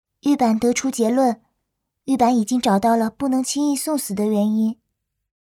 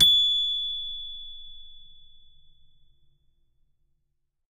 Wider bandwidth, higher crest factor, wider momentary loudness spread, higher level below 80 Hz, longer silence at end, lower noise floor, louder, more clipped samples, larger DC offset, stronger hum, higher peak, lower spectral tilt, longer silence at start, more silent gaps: first, 17 kHz vs 14.5 kHz; second, 16 dB vs 22 dB; second, 7 LU vs 26 LU; second, -60 dBFS vs -52 dBFS; second, 0.7 s vs 2.55 s; about the same, -76 dBFS vs -75 dBFS; first, -20 LUFS vs -23 LUFS; neither; neither; neither; first, -4 dBFS vs -8 dBFS; first, -5 dB/octave vs -0.5 dB/octave; first, 0.25 s vs 0 s; neither